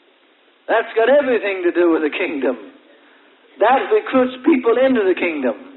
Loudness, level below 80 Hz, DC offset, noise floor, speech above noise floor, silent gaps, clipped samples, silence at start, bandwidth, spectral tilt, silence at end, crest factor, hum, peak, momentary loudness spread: -17 LUFS; -66 dBFS; under 0.1%; -54 dBFS; 38 dB; none; under 0.1%; 0.7 s; 4.2 kHz; -9 dB/octave; 0 s; 14 dB; none; -4 dBFS; 7 LU